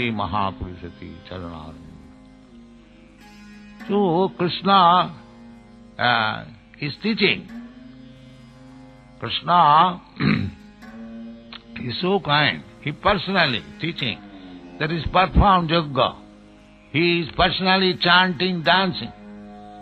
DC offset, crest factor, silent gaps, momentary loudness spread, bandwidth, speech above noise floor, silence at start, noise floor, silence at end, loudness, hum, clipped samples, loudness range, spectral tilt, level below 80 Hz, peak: under 0.1%; 22 dB; none; 23 LU; 8 kHz; 28 dB; 0 s; -48 dBFS; 0 s; -20 LUFS; 50 Hz at -55 dBFS; under 0.1%; 7 LU; -7 dB/octave; -38 dBFS; -2 dBFS